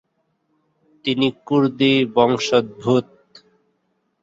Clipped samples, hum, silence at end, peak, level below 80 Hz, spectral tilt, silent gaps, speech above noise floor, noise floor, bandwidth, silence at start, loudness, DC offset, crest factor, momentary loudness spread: under 0.1%; none; 1.2 s; -2 dBFS; -60 dBFS; -5.5 dB/octave; none; 51 dB; -69 dBFS; 7.8 kHz; 1.05 s; -19 LUFS; under 0.1%; 20 dB; 5 LU